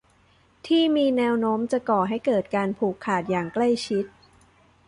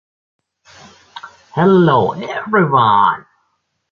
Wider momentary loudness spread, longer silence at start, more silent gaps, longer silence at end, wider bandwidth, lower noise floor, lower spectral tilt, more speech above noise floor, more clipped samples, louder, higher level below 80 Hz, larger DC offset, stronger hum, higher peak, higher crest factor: second, 7 LU vs 22 LU; second, 0.65 s vs 1.15 s; neither; about the same, 0.8 s vs 0.7 s; first, 11 kHz vs 7 kHz; second, -60 dBFS vs -67 dBFS; second, -6 dB/octave vs -8 dB/octave; second, 37 dB vs 54 dB; neither; second, -24 LUFS vs -13 LUFS; second, -62 dBFS vs -54 dBFS; neither; neither; second, -10 dBFS vs 0 dBFS; about the same, 14 dB vs 16 dB